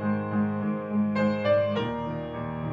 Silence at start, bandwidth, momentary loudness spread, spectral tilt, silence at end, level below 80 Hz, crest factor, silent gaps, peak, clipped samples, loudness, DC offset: 0 s; 5.8 kHz; 9 LU; -9 dB/octave; 0 s; -54 dBFS; 14 dB; none; -14 dBFS; under 0.1%; -27 LUFS; under 0.1%